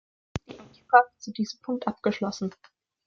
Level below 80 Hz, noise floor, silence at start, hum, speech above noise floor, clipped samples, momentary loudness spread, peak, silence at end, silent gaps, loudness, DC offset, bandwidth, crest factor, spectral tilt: -60 dBFS; -48 dBFS; 0.35 s; none; 22 dB; under 0.1%; 19 LU; -4 dBFS; 0.55 s; none; -26 LUFS; under 0.1%; 7.4 kHz; 24 dB; -5 dB/octave